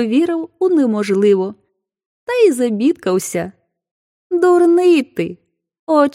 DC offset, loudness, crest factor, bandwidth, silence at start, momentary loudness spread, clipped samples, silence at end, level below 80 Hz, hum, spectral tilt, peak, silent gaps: under 0.1%; -15 LUFS; 14 dB; 15 kHz; 0 s; 13 LU; under 0.1%; 0.05 s; -64 dBFS; none; -5.5 dB/octave; -2 dBFS; 2.06-2.27 s, 3.91-4.30 s, 5.79-5.87 s